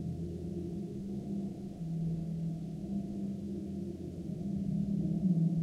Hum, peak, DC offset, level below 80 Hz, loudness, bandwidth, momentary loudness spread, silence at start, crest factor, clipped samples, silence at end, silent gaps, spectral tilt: none; -20 dBFS; under 0.1%; -54 dBFS; -37 LUFS; 8.4 kHz; 9 LU; 0 s; 16 dB; under 0.1%; 0 s; none; -10 dB/octave